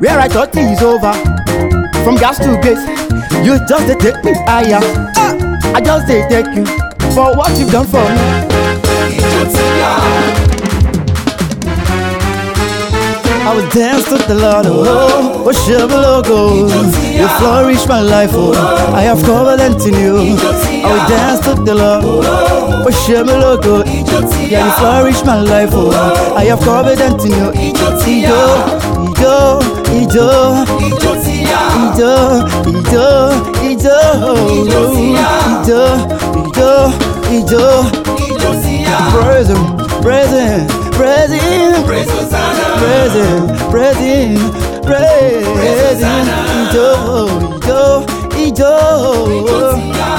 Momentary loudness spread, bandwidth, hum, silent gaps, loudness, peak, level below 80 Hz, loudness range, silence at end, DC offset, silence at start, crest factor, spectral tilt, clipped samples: 5 LU; 19.5 kHz; none; none; -10 LUFS; 0 dBFS; -22 dBFS; 2 LU; 0 s; under 0.1%; 0 s; 10 dB; -5.5 dB/octave; under 0.1%